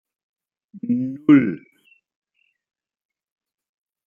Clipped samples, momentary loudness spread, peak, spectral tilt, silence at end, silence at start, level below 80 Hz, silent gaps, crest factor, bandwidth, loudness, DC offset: under 0.1%; 19 LU; -2 dBFS; -9.5 dB/octave; 2.5 s; 0.75 s; -72 dBFS; none; 22 dB; 3.4 kHz; -18 LUFS; under 0.1%